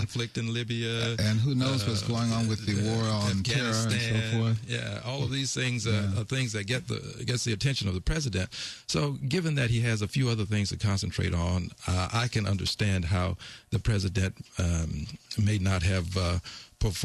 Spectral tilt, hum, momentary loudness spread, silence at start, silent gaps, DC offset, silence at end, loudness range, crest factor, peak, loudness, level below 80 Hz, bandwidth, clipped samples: -5 dB/octave; none; 6 LU; 0 s; none; under 0.1%; 0 s; 2 LU; 14 dB; -14 dBFS; -29 LUFS; -40 dBFS; 13 kHz; under 0.1%